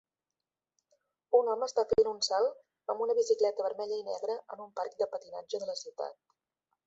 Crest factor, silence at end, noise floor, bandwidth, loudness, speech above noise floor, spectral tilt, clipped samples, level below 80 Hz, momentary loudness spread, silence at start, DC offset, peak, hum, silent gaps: 20 dB; 0.75 s; under -90 dBFS; 8.2 kHz; -32 LUFS; over 58 dB; -2.5 dB/octave; under 0.1%; -70 dBFS; 13 LU; 1.3 s; under 0.1%; -12 dBFS; none; none